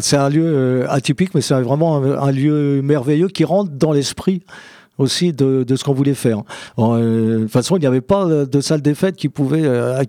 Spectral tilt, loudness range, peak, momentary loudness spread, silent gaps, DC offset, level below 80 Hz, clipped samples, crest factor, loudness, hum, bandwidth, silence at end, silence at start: -6 dB/octave; 2 LU; -2 dBFS; 4 LU; none; under 0.1%; -54 dBFS; under 0.1%; 14 dB; -16 LUFS; none; 15.5 kHz; 0 s; 0 s